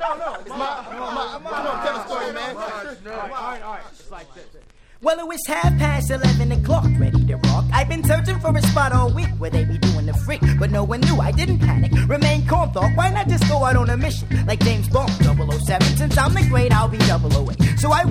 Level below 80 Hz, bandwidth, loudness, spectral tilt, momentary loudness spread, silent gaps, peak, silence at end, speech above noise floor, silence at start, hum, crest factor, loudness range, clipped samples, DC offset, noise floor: -28 dBFS; 16 kHz; -19 LUFS; -6 dB/octave; 11 LU; none; 0 dBFS; 0 s; 28 dB; 0 s; none; 18 dB; 10 LU; under 0.1%; under 0.1%; -45 dBFS